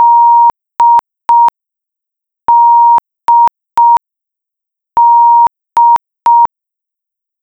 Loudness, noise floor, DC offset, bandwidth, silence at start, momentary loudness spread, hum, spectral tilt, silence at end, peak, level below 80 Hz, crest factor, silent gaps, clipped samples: -8 LUFS; -81 dBFS; under 0.1%; 5.8 kHz; 0 s; 6 LU; none; -3 dB/octave; 0.95 s; -2 dBFS; -56 dBFS; 8 dB; none; under 0.1%